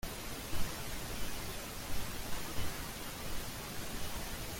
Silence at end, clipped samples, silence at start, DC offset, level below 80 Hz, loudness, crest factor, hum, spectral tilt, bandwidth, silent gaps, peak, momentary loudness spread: 0 s; under 0.1%; 0.05 s; under 0.1%; -46 dBFS; -42 LUFS; 16 dB; none; -3 dB/octave; 17 kHz; none; -20 dBFS; 2 LU